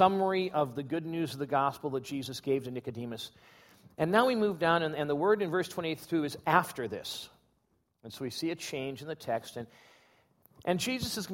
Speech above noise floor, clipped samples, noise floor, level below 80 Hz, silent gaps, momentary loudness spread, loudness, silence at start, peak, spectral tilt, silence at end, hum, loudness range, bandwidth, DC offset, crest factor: 43 dB; under 0.1%; -75 dBFS; -68 dBFS; none; 13 LU; -32 LUFS; 0 s; -8 dBFS; -5 dB/octave; 0 s; none; 9 LU; 16.5 kHz; under 0.1%; 24 dB